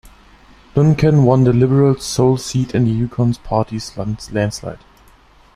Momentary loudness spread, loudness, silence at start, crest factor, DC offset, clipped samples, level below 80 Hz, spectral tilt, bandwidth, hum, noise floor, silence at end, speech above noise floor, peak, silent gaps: 12 LU; -16 LUFS; 0.05 s; 14 dB; under 0.1%; under 0.1%; -40 dBFS; -7 dB/octave; 13.5 kHz; none; -48 dBFS; 0.8 s; 33 dB; -2 dBFS; none